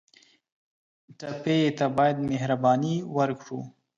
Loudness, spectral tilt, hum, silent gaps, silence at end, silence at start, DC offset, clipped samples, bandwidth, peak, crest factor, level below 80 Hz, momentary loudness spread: -25 LUFS; -7 dB/octave; none; none; 0.3 s; 1.2 s; under 0.1%; under 0.1%; 7.8 kHz; -10 dBFS; 16 dB; -66 dBFS; 15 LU